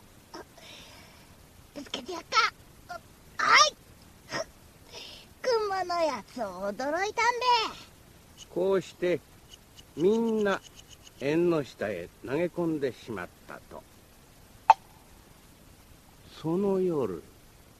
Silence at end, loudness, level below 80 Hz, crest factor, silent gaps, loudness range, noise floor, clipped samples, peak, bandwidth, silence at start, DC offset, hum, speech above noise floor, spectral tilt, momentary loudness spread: 0.6 s; -28 LUFS; -60 dBFS; 26 dB; none; 5 LU; -55 dBFS; under 0.1%; -4 dBFS; 14 kHz; 0.35 s; under 0.1%; none; 27 dB; -3.5 dB/octave; 23 LU